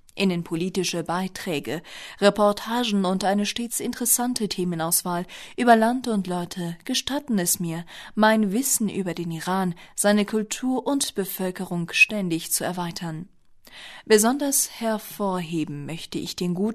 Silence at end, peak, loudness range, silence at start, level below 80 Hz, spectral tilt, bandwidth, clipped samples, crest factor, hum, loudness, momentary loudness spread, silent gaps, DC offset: 0 s; -6 dBFS; 2 LU; 0.15 s; -58 dBFS; -3.5 dB/octave; 13.5 kHz; under 0.1%; 18 dB; none; -24 LUFS; 12 LU; none; under 0.1%